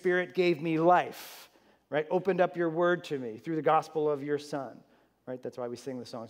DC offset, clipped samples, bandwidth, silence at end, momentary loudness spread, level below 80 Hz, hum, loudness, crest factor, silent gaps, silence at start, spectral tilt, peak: under 0.1%; under 0.1%; 16 kHz; 0 s; 14 LU; -84 dBFS; none; -30 LUFS; 18 dB; none; 0.05 s; -6.5 dB/octave; -12 dBFS